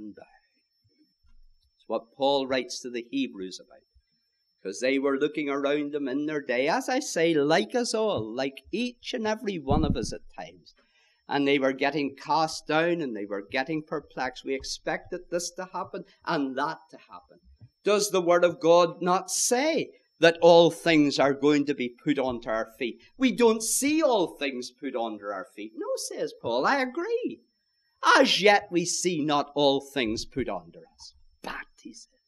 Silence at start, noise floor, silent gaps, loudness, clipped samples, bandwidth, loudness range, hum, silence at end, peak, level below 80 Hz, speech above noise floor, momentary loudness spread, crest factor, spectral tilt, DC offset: 0 s; -74 dBFS; none; -26 LUFS; under 0.1%; 14.5 kHz; 9 LU; none; 0.25 s; -4 dBFS; -50 dBFS; 48 dB; 15 LU; 22 dB; -3.5 dB/octave; under 0.1%